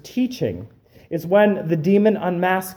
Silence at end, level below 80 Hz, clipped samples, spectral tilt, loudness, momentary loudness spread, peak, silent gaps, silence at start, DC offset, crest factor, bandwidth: 0 s; -58 dBFS; under 0.1%; -7 dB/octave; -19 LUFS; 12 LU; -4 dBFS; none; 0.05 s; under 0.1%; 16 dB; 19.5 kHz